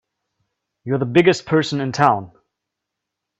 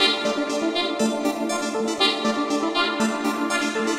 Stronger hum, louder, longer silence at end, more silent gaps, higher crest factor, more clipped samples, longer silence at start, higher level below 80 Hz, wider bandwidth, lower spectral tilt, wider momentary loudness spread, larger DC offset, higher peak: neither; first, -18 LUFS vs -23 LUFS; first, 1.15 s vs 0 s; neither; about the same, 20 dB vs 20 dB; neither; first, 0.85 s vs 0 s; first, -58 dBFS vs -66 dBFS; second, 8.2 kHz vs 16 kHz; first, -6 dB/octave vs -2.5 dB/octave; first, 9 LU vs 5 LU; neither; first, 0 dBFS vs -4 dBFS